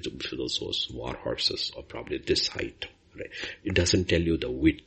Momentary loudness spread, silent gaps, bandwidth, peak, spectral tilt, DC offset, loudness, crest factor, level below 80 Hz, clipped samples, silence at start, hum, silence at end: 15 LU; none; 8.4 kHz; -8 dBFS; -4 dB/octave; under 0.1%; -28 LUFS; 22 dB; -46 dBFS; under 0.1%; 0 s; none; 0.05 s